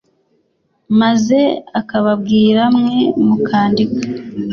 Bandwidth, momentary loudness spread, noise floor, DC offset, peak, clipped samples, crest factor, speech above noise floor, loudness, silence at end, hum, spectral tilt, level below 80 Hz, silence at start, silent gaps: 7 kHz; 8 LU; -62 dBFS; under 0.1%; -2 dBFS; under 0.1%; 12 dB; 49 dB; -14 LUFS; 0 s; none; -6.5 dB/octave; -52 dBFS; 0.9 s; none